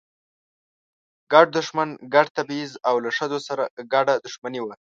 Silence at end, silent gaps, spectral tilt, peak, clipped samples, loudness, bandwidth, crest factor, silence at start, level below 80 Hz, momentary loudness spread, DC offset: 0.2 s; 2.30-2.35 s, 3.70-3.77 s, 4.38-4.42 s; -4 dB/octave; 0 dBFS; under 0.1%; -22 LUFS; 7.8 kHz; 22 dB; 1.3 s; -76 dBFS; 13 LU; under 0.1%